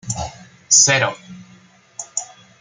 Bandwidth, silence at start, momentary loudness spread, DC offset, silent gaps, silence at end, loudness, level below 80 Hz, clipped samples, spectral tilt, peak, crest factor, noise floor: 11 kHz; 0.05 s; 24 LU; under 0.1%; none; 0.35 s; -16 LUFS; -50 dBFS; under 0.1%; -1 dB/octave; 0 dBFS; 20 dB; -49 dBFS